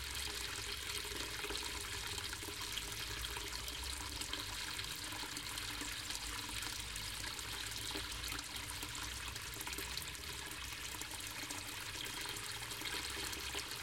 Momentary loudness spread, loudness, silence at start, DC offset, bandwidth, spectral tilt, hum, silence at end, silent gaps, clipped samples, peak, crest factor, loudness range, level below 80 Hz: 3 LU; -42 LUFS; 0 s; under 0.1%; 17 kHz; -1.5 dB/octave; none; 0 s; none; under 0.1%; -24 dBFS; 20 dB; 2 LU; -56 dBFS